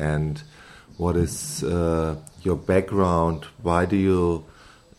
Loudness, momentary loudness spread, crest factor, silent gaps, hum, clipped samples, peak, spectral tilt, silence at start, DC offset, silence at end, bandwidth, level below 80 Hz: -24 LUFS; 9 LU; 18 dB; none; none; under 0.1%; -4 dBFS; -6.5 dB/octave; 0 s; under 0.1%; 0.55 s; 13.5 kHz; -40 dBFS